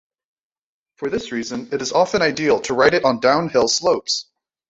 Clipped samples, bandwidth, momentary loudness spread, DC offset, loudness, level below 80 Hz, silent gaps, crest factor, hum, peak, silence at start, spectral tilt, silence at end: under 0.1%; 8 kHz; 10 LU; under 0.1%; -18 LUFS; -54 dBFS; none; 18 dB; none; -2 dBFS; 1 s; -3 dB/octave; 0.5 s